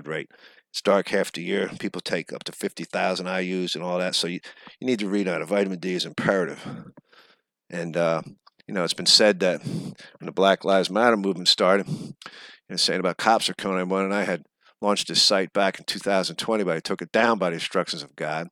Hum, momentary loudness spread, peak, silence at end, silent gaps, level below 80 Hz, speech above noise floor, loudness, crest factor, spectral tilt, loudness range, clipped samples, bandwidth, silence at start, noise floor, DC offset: none; 14 LU; -2 dBFS; 0.05 s; none; -72 dBFS; 36 dB; -23 LUFS; 22 dB; -3.5 dB/octave; 6 LU; under 0.1%; 17.5 kHz; 0 s; -61 dBFS; under 0.1%